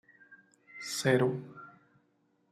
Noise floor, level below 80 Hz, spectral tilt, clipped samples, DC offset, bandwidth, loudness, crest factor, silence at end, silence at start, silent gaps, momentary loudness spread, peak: -73 dBFS; -74 dBFS; -5 dB/octave; under 0.1%; under 0.1%; 14.5 kHz; -30 LUFS; 22 dB; 0.85 s; 0.3 s; none; 24 LU; -12 dBFS